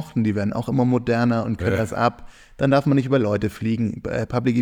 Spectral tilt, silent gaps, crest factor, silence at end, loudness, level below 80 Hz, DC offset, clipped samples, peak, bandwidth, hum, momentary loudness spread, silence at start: -8 dB/octave; none; 16 dB; 0 s; -22 LUFS; -46 dBFS; under 0.1%; under 0.1%; -4 dBFS; 14.5 kHz; none; 5 LU; 0 s